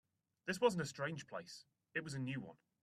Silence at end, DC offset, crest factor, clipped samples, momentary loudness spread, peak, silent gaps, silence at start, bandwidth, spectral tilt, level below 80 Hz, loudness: 0.3 s; under 0.1%; 22 dB; under 0.1%; 17 LU; -20 dBFS; none; 0.45 s; 13.5 kHz; -5 dB/octave; -80 dBFS; -42 LUFS